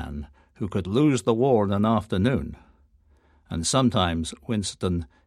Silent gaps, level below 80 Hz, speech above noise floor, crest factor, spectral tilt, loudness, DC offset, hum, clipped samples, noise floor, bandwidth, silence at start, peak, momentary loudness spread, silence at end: none; -44 dBFS; 36 dB; 18 dB; -5.5 dB/octave; -24 LUFS; under 0.1%; none; under 0.1%; -60 dBFS; 13 kHz; 0 s; -6 dBFS; 14 LU; 0.2 s